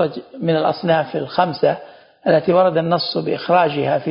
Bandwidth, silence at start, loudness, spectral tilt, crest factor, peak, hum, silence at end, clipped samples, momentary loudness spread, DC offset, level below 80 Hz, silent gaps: 5.4 kHz; 0 s; -18 LUFS; -11 dB/octave; 16 dB; -2 dBFS; none; 0 s; under 0.1%; 7 LU; under 0.1%; -60 dBFS; none